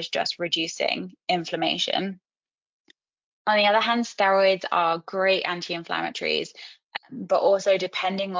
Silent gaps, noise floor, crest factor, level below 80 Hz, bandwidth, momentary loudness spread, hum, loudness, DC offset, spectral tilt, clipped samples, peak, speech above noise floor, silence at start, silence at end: 2.54-2.85 s, 3.24-3.45 s, 6.84-6.89 s; under -90 dBFS; 16 dB; -76 dBFS; 7.6 kHz; 11 LU; none; -24 LUFS; under 0.1%; -3.5 dB/octave; under 0.1%; -8 dBFS; over 66 dB; 0 s; 0 s